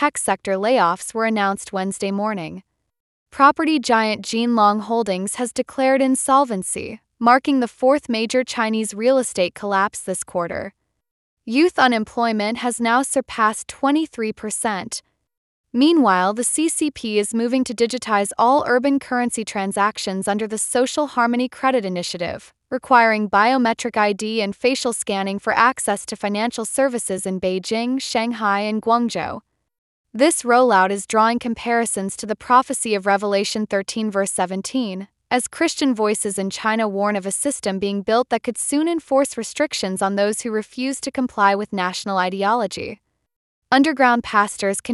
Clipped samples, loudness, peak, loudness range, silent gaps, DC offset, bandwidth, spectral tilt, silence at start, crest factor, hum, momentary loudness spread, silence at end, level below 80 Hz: under 0.1%; -20 LUFS; -2 dBFS; 3 LU; 3.00-3.26 s, 11.11-11.37 s, 15.37-15.64 s, 29.78-30.04 s, 43.36-43.62 s; under 0.1%; 12 kHz; -3.5 dB/octave; 0 s; 18 dB; none; 9 LU; 0 s; -60 dBFS